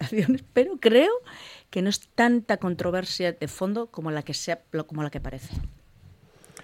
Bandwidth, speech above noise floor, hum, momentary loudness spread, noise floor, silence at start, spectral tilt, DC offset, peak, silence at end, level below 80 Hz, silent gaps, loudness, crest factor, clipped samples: 16.5 kHz; 28 dB; none; 16 LU; -53 dBFS; 0 s; -5 dB/octave; under 0.1%; -6 dBFS; 0.55 s; -46 dBFS; none; -25 LUFS; 20 dB; under 0.1%